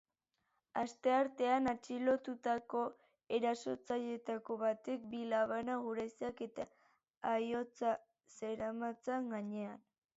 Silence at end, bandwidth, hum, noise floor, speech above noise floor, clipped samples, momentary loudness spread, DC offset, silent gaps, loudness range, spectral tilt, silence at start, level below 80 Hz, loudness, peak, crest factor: 0.4 s; 8 kHz; none; -86 dBFS; 47 dB; under 0.1%; 10 LU; under 0.1%; 7.17-7.21 s; 4 LU; -3.5 dB/octave; 0.75 s; -78 dBFS; -39 LUFS; -22 dBFS; 16 dB